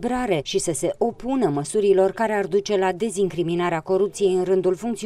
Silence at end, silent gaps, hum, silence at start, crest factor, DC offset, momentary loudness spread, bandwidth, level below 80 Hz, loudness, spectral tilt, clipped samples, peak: 0 s; none; none; 0 s; 14 dB; under 0.1%; 5 LU; 13.5 kHz; -50 dBFS; -22 LUFS; -5 dB/octave; under 0.1%; -8 dBFS